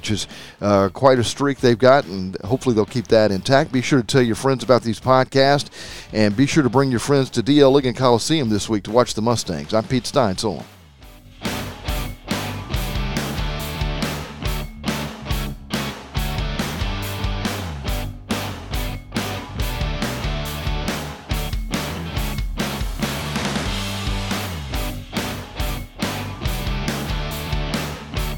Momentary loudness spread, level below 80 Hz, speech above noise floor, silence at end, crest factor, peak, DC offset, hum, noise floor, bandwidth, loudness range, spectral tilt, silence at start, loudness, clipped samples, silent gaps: 11 LU; -32 dBFS; 26 dB; 0 s; 20 dB; 0 dBFS; under 0.1%; none; -44 dBFS; 19 kHz; 9 LU; -5 dB/octave; 0 s; -21 LUFS; under 0.1%; none